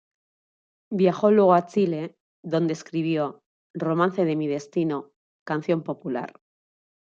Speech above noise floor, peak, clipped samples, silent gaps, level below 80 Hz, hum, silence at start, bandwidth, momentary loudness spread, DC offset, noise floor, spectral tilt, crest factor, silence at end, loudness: over 67 dB; -4 dBFS; under 0.1%; 2.20-2.43 s, 3.46-3.74 s, 5.16-5.46 s; -74 dBFS; none; 0.9 s; 7.6 kHz; 14 LU; under 0.1%; under -90 dBFS; -7.5 dB/octave; 20 dB; 0.8 s; -24 LUFS